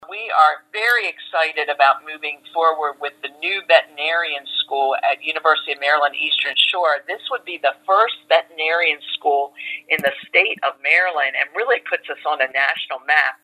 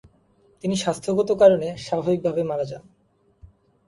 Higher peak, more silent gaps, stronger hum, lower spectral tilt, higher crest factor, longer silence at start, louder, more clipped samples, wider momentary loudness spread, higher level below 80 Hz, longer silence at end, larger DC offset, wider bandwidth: about the same, 0 dBFS vs -2 dBFS; neither; neither; second, -1.5 dB/octave vs -6 dB/octave; about the same, 20 dB vs 20 dB; second, 0 s vs 0.65 s; first, -18 LUFS vs -22 LUFS; neither; second, 9 LU vs 14 LU; second, -80 dBFS vs -58 dBFS; second, 0.1 s vs 0.4 s; neither; first, 15.5 kHz vs 11.5 kHz